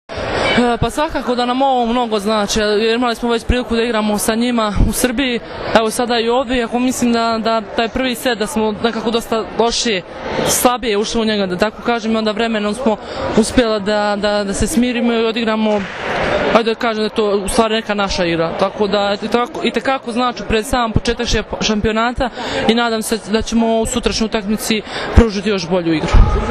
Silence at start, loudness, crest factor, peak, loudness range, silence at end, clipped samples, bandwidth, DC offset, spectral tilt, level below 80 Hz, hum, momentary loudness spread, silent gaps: 0.1 s; -16 LUFS; 16 dB; 0 dBFS; 1 LU; 0 s; 0.1%; 14 kHz; under 0.1%; -4.5 dB/octave; -26 dBFS; none; 4 LU; none